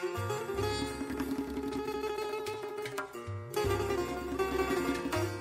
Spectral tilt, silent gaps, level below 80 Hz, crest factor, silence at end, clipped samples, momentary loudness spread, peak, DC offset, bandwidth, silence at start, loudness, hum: -5 dB/octave; none; -50 dBFS; 16 dB; 0 s; under 0.1%; 7 LU; -18 dBFS; under 0.1%; 16 kHz; 0 s; -35 LUFS; none